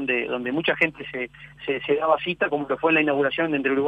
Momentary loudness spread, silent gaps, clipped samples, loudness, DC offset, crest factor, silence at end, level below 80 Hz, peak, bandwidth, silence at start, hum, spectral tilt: 12 LU; none; under 0.1%; -23 LUFS; under 0.1%; 18 dB; 0 s; -60 dBFS; -6 dBFS; 8 kHz; 0 s; none; -7 dB/octave